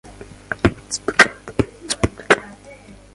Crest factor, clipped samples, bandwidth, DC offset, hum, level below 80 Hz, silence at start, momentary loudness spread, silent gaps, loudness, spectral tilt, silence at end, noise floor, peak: 22 dB; under 0.1%; 11.5 kHz; under 0.1%; none; -38 dBFS; 0.5 s; 11 LU; none; -19 LUFS; -4 dB/octave; 0.6 s; -42 dBFS; 0 dBFS